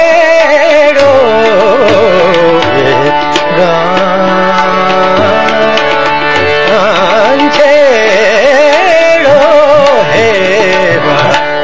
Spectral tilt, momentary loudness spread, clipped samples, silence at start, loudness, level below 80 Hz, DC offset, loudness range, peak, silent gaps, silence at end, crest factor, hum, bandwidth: -4.5 dB/octave; 4 LU; 3%; 0 s; -6 LUFS; -40 dBFS; 8%; 3 LU; 0 dBFS; none; 0 s; 6 dB; none; 8 kHz